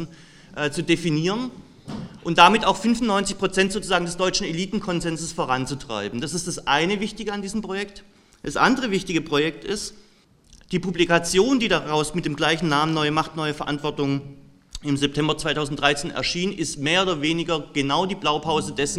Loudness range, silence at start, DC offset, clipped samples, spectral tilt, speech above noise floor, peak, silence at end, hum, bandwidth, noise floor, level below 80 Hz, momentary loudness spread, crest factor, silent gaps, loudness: 5 LU; 0 s; under 0.1%; under 0.1%; -4 dB/octave; 33 dB; 0 dBFS; 0 s; none; 14.5 kHz; -56 dBFS; -46 dBFS; 10 LU; 24 dB; none; -22 LUFS